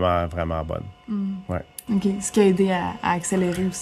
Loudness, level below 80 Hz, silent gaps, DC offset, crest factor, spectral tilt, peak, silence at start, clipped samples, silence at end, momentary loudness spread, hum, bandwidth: -24 LUFS; -46 dBFS; none; under 0.1%; 18 dB; -5.5 dB/octave; -6 dBFS; 0 s; under 0.1%; 0 s; 12 LU; none; 14 kHz